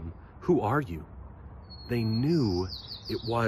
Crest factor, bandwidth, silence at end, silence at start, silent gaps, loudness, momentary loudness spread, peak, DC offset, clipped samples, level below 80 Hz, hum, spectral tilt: 16 dB; 14.5 kHz; 0 s; 0 s; none; -29 LUFS; 21 LU; -14 dBFS; under 0.1%; under 0.1%; -46 dBFS; none; -7.5 dB/octave